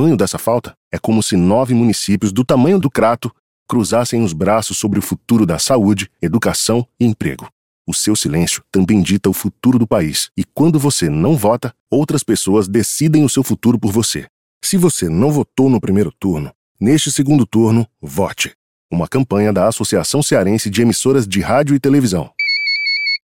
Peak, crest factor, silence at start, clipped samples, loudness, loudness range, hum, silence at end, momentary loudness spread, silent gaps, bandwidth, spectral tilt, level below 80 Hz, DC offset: -2 dBFS; 14 dB; 0 s; under 0.1%; -15 LUFS; 2 LU; none; 0.1 s; 7 LU; 0.77-0.91 s, 3.39-3.66 s, 7.52-7.85 s, 11.80-11.87 s, 14.30-14.61 s, 16.55-16.75 s, 18.55-18.89 s; 17 kHz; -5 dB/octave; -44 dBFS; under 0.1%